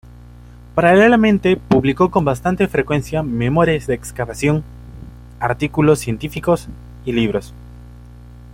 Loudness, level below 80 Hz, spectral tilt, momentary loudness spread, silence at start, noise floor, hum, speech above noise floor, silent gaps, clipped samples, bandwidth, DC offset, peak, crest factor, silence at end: -17 LUFS; -38 dBFS; -6.5 dB/octave; 14 LU; 0.75 s; -39 dBFS; 60 Hz at -35 dBFS; 23 dB; none; under 0.1%; 16.5 kHz; under 0.1%; -2 dBFS; 16 dB; 0 s